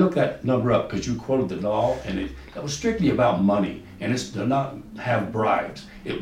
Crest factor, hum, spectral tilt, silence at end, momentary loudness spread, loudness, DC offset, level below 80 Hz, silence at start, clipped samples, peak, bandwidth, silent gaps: 16 dB; none; -6 dB/octave; 0 s; 12 LU; -24 LUFS; under 0.1%; -46 dBFS; 0 s; under 0.1%; -8 dBFS; 15 kHz; none